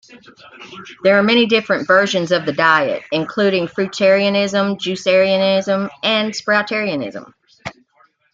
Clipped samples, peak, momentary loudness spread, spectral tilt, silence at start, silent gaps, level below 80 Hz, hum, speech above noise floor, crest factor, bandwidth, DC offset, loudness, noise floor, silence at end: under 0.1%; 0 dBFS; 19 LU; -4.5 dB/octave; 0.1 s; none; -62 dBFS; none; 40 dB; 16 dB; 7.8 kHz; under 0.1%; -16 LUFS; -57 dBFS; 0.65 s